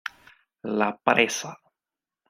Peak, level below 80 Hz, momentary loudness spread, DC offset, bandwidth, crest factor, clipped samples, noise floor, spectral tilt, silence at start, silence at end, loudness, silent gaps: -2 dBFS; -70 dBFS; 18 LU; under 0.1%; 16 kHz; 26 dB; under 0.1%; under -90 dBFS; -3 dB/octave; 0.05 s; 0.75 s; -24 LUFS; none